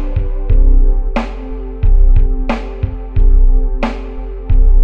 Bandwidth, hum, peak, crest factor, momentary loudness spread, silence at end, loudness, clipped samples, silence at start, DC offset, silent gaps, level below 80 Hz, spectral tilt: 3.8 kHz; none; 0 dBFS; 10 dB; 12 LU; 0 s; -17 LUFS; under 0.1%; 0 s; under 0.1%; none; -10 dBFS; -8.5 dB/octave